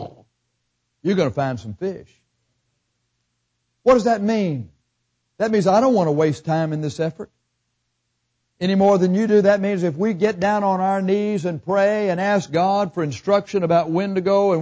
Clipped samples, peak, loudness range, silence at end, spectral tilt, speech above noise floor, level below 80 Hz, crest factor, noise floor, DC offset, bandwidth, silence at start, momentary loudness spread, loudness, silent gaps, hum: under 0.1%; -4 dBFS; 5 LU; 0 s; -7 dB/octave; 55 dB; -58 dBFS; 16 dB; -73 dBFS; under 0.1%; 8 kHz; 0 s; 10 LU; -20 LUFS; none; 60 Hz at -45 dBFS